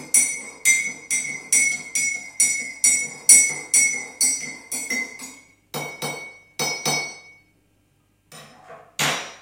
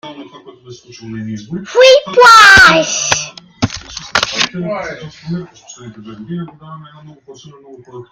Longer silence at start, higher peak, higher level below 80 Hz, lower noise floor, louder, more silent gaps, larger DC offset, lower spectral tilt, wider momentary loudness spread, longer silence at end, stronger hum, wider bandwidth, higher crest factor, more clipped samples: about the same, 0 s vs 0.05 s; about the same, 0 dBFS vs 0 dBFS; second, -70 dBFS vs -44 dBFS; first, -63 dBFS vs -35 dBFS; second, -19 LUFS vs -8 LUFS; neither; neither; second, 0.5 dB/octave vs -2.5 dB/octave; second, 17 LU vs 24 LU; about the same, 0.05 s vs 0.1 s; neither; second, 16.5 kHz vs over 20 kHz; first, 24 dB vs 14 dB; second, under 0.1% vs 1%